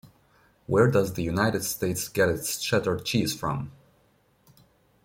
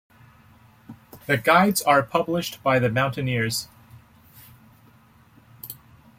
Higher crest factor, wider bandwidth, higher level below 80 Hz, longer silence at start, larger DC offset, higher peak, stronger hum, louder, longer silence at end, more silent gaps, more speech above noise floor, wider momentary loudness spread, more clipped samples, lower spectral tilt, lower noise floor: about the same, 20 dB vs 22 dB; about the same, 16.5 kHz vs 16.5 kHz; first, -54 dBFS vs -60 dBFS; second, 0.05 s vs 0.9 s; neither; second, -8 dBFS vs -2 dBFS; neither; second, -26 LUFS vs -21 LUFS; first, 1.35 s vs 0.45 s; neither; first, 39 dB vs 33 dB; second, 8 LU vs 22 LU; neither; about the same, -4.5 dB/octave vs -4.5 dB/octave; first, -64 dBFS vs -54 dBFS